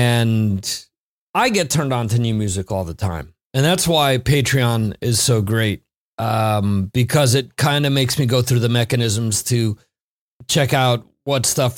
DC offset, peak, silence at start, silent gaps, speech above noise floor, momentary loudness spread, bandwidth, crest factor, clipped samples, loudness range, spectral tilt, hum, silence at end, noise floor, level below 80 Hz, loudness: under 0.1%; -2 dBFS; 0 s; 0.98-1.34 s, 3.45-3.50 s, 5.96-6.18 s, 10.01-10.40 s; over 72 dB; 9 LU; 17 kHz; 16 dB; under 0.1%; 2 LU; -4.5 dB/octave; none; 0 s; under -90 dBFS; -44 dBFS; -18 LUFS